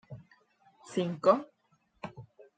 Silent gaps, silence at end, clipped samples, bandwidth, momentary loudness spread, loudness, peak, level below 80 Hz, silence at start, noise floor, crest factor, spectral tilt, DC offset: none; 0.35 s; under 0.1%; 9.2 kHz; 25 LU; -30 LUFS; -10 dBFS; -74 dBFS; 0.1 s; -72 dBFS; 24 dB; -6.5 dB/octave; under 0.1%